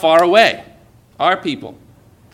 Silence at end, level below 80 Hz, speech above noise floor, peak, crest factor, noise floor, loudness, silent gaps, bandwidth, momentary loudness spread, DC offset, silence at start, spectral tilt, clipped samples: 0.6 s; -58 dBFS; 33 dB; 0 dBFS; 16 dB; -47 dBFS; -14 LUFS; none; 14.5 kHz; 19 LU; under 0.1%; 0 s; -4 dB/octave; under 0.1%